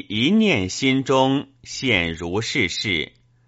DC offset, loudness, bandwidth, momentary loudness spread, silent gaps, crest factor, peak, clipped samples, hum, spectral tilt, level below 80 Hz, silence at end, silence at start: under 0.1%; -20 LUFS; 8 kHz; 8 LU; none; 18 dB; -4 dBFS; under 0.1%; none; -3.5 dB/octave; -50 dBFS; 0.4 s; 0.1 s